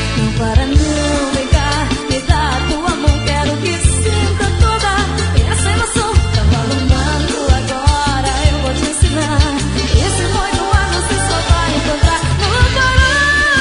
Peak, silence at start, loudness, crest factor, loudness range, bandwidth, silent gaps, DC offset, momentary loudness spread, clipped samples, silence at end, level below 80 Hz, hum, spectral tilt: 0 dBFS; 0 s; -14 LUFS; 14 dB; 1 LU; 11 kHz; none; under 0.1%; 4 LU; under 0.1%; 0 s; -18 dBFS; none; -4.5 dB/octave